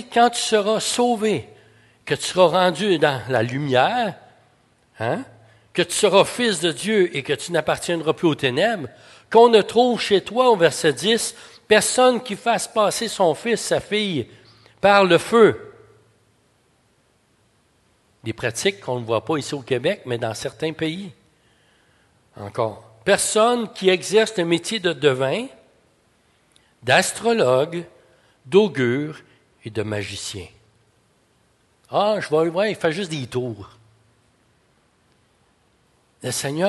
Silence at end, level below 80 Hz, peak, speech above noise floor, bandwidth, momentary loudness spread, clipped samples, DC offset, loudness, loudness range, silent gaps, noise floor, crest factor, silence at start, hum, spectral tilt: 0 s; -58 dBFS; -2 dBFS; 42 dB; 12.5 kHz; 13 LU; under 0.1%; under 0.1%; -20 LUFS; 10 LU; none; -62 dBFS; 20 dB; 0 s; none; -4 dB/octave